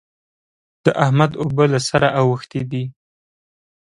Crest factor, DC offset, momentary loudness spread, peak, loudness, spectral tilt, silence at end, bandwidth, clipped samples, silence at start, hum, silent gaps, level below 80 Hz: 20 dB; under 0.1%; 10 LU; 0 dBFS; -18 LUFS; -6 dB/octave; 1.05 s; 11 kHz; under 0.1%; 0.85 s; none; none; -52 dBFS